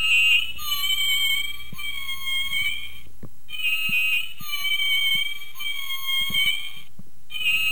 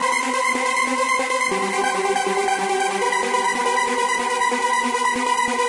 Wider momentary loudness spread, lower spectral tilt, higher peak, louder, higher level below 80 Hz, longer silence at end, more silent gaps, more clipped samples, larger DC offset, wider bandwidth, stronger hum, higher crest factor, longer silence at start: first, 12 LU vs 1 LU; second, 1 dB/octave vs -1.5 dB/octave; about the same, -10 dBFS vs -8 dBFS; about the same, -22 LUFS vs -20 LUFS; first, -52 dBFS vs -62 dBFS; about the same, 0 s vs 0 s; neither; neither; first, 5% vs under 0.1%; first, over 20 kHz vs 11.5 kHz; neither; about the same, 14 dB vs 12 dB; about the same, 0 s vs 0 s